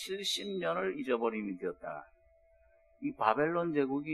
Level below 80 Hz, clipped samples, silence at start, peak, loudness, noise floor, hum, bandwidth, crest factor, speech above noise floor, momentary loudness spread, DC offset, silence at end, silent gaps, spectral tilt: -70 dBFS; under 0.1%; 0 s; -12 dBFS; -34 LUFS; -66 dBFS; none; 13 kHz; 24 dB; 32 dB; 11 LU; under 0.1%; 0 s; none; -4.5 dB/octave